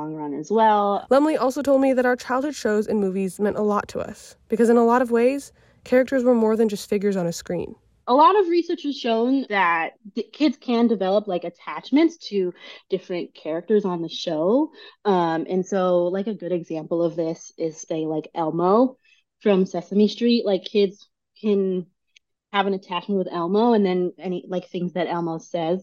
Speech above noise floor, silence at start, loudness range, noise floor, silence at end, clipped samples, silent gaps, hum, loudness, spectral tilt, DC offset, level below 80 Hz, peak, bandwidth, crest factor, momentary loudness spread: 41 dB; 0 s; 4 LU; -62 dBFS; 0 s; under 0.1%; none; none; -22 LUFS; -6 dB/octave; under 0.1%; -64 dBFS; -6 dBFS; 14.5 kHz; 16 dB; 11 LU